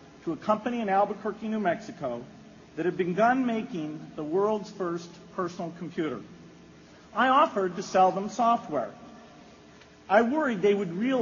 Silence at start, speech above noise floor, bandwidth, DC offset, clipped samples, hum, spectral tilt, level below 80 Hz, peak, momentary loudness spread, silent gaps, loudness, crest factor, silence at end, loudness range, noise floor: 0 s; 26 dB; 7.2 kHz; under 0.1%; under 0.1%; none; -4.5 dB/octave; -68 dBFS; -8 dBFS; 14 LU; none; -27 LUFS; 20 dB; 0 s; 5 LU; -52 dBFS